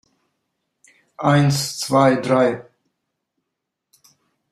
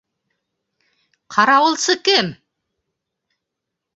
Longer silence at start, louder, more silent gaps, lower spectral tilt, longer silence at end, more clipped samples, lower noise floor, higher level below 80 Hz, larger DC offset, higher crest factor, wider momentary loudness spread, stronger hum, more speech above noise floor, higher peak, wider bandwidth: about the same, 1.2 s vs 1.3 s; about the same, -18 LUFS vs -16 LUFS; neither; first, -5.5 dB/octave vs -2 dB/octave; first, 1.9 s vs 1.6 s; neither; about the same, -80 dBFS vs -81 dBFS; first, -60 dBFS vs -70 dBFS; neither; about the same, 20 dB vs 20 dB; about the same, 7 LU vs 8 LU; neither; about the same, 63 dB vs 65 dB; about the same, -2 dBFS vs 0 dBFS; first, 14 kHz vs 8.2 kHz